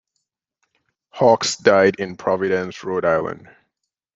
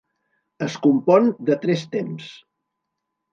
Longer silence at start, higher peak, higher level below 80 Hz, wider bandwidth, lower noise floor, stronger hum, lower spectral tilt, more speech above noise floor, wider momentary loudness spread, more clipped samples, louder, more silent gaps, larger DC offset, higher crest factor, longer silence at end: first, 1.15 s vs 0.6 s; about the same, -2 dBFS vs -2 dBFS; first, -62 dBFS vs -74 dBFS; about the same, 7.8 kHz vs 7.6 kHz; about the same, -78 dBFS vs -79 dBFS; neither; second, -4 dB/octave vs -7 dB/octave; about the same, 60 dB vs 60 dB; second, 10 LU vs 16 LU; neither; about the same, -18 LUFS vs -20 LUFS; neither; neither; about the same, 18 dB vs 20 dB; second, 0.8 s vs 0.95 s